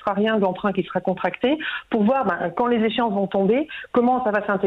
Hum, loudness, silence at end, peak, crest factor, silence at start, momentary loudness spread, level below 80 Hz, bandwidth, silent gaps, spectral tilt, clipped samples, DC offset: none; -22 LUFS; 0 s; -10 dBFS; 12 dB; 0.05 s; 5 LU; -58 dBFS; 5 kHz; none; -8.5 dB/octave; under 0.1%; under 0.1%